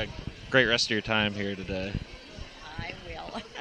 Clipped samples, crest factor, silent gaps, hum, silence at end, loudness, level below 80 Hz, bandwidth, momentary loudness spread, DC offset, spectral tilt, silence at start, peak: under 0.1%; 24 dB; none; none; 0 s; -28 LUFS; -46 dBFS; 10 kHz; 20 LU; under 0.1%; -4 dB/octave; 0 s; -6 dBFS